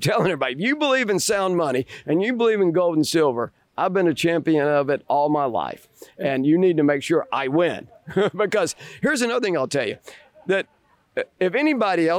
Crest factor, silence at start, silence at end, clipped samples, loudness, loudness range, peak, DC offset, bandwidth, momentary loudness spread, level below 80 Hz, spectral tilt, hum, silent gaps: 12 dB; 0 s; 0 s; under 0.1%; -21 LUFS; 3 LU; -10 dBFS; under 0.1%; 18.5 kHz; 9 LU; -64 dBFS; -5 dB/octave; none; none